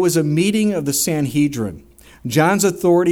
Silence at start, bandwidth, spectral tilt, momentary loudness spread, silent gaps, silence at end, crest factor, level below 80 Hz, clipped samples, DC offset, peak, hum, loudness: 0 s; 17.5 kHz; -5 dB/octave; 8 LU; none; 0 s; 14 dB; -50 dBFS; under 0.1%; under 0.1%; -2 dBFS; none; -17 LUFS